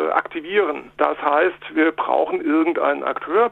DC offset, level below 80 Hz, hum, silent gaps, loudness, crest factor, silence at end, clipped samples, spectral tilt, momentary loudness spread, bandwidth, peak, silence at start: under 0.1%; -62 dBFS; none; none; -20 LUFS; 18 dB; 0 s; under 0.1%; -6.5 dB/octave; 4 LU; 4.1 kHz; -2 dBFS; 0 s